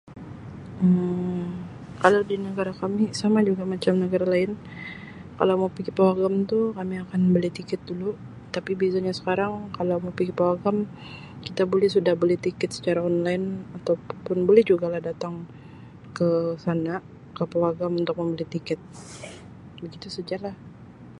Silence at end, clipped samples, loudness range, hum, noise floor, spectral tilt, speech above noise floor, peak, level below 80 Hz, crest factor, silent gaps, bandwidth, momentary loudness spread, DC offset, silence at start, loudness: 0 s; under 0.1%; 4 LU; none; -44 dBFS; -7 dB/octave; 20 dB; -2 dBFS; -58 dBFS; 24 dB; none; 11 kHz; 19 LU; under 0.1%; 0.05 s; -25 LUFS